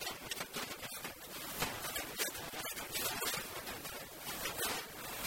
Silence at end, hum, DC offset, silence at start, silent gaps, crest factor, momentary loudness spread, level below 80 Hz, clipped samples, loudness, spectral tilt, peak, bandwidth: 0 s; none; under 0.1%; 0 s; none; 20 dB; 7 LU; -64 dBFS; under 0.1%; -40 LUFS; -1.5 dB/octave; -22 dBFS; 16.5 kHz